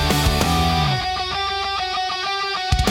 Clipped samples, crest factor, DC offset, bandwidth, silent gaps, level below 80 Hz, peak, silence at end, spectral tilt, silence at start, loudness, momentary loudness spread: under 0.1%; 16 dB; under 0.1%; 18 kHz; none; -30 dBFS; -4 dBFS; 0 s; -4 dB/octave; 0 s; -20 LUFS; 4 LU